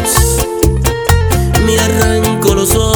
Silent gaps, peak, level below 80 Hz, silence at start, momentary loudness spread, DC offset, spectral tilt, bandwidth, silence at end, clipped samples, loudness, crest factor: none; 0 dBFS; -18 dBFS; 0 s; 2 LU; under 0.1%; -4.5 dB/octave; over 20 kHz; 0 s; 0.2%; -11 LUFS; 10 dB